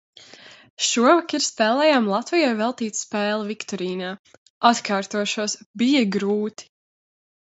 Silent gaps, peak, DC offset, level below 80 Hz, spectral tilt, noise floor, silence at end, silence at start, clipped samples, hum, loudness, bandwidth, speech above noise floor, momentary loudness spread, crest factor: 0.70-0.77 s, 4.19-4.24 s, 4.37-4.61 s, 5.66-5.74 s; -2 dBFS; under 0.1%; -72 dBFS; -3.5 dB/octave; -47 dBFS; 0.95 s; 0.45 s; under 0.1%; none; -21 LUFS; 8.2 kHz; 25 dB; 10 LU; 22 dB